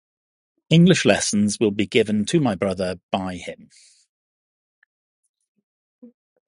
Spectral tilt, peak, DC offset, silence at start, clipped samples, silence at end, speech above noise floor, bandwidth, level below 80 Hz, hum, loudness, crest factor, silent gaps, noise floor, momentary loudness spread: -5 dB/octave; 0 dBFS; under 0.1%; 0.7 s; under 0.1%; 0.45 s; over 70 dB; 11.5 kHz; -54 dBFS; none; -20 LUFS; 22 dB; 3.03-3.09 s, 4.09-5.23 s, 5.29-5.34 s, 5.48-5.55 s, 5.63-5.99 s; under -90 dBFS; 12 LU